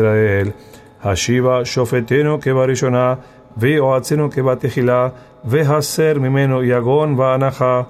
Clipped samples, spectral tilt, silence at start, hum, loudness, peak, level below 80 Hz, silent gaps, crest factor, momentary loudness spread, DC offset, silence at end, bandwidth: under 0.1%; -6 dB/octave; 0 s; none; -16 LUFS; -4 dBFS; -46 dBFS; none; 12 dB; 6 LU; under 0.1%; 0 s; 15 kHz